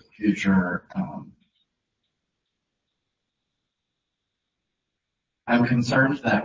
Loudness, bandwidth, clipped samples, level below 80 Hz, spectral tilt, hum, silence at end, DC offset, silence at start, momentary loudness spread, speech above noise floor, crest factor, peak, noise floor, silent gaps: -23 LUFS; 7.6 kHz; under 0.1%; -56 dBFS; -7 dB/octave; none; 0 s; under 0.1%; 0.2 s; 13 LU; 60 dB; 20 dB; -6 dBFS; -83 dBFS; none